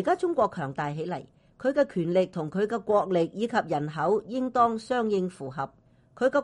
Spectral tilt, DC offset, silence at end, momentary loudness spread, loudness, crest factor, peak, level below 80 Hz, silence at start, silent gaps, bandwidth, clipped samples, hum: -7 dB/octave; under 0.1%; 0 s; 10 LU; -27 LUFS; 16 dB; -10 dBFS; -64 dBFS; 0 s; none; 11 kHz; under 0.1%; none